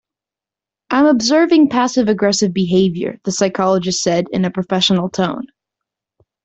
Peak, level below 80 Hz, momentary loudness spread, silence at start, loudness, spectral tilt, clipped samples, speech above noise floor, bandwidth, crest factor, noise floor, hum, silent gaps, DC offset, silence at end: -2 dBFS; -54 dBFS; 8 LU; 0.9 s; -15 LUFS; -4.5 dB/octave; under 0.1%; 73 dB; 8.2 kHz; 14 dB; -88 dBFS; none; none; under 0.1%; 1 s